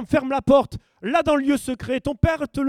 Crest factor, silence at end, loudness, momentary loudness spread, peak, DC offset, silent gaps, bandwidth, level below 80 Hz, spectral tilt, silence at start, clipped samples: 18 dB; 0 s; -21 LUFS; 8 LU; -4 dBFS; under 0.1%; none; 14.5 kHz; -42 dBFS; -6.5 dB/octave; 0 s; under 0.1%